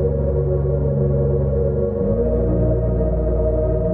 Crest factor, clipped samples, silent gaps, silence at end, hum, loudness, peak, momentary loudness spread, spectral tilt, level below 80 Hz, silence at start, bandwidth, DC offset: 10 dB; under 0.1%; none; 0 s; none; -19 LUFS; -8 dBFS; 1 LU; -14.5 dB/octave; -24 dBFS; 0 s; 2.3 kHz; under 0.1%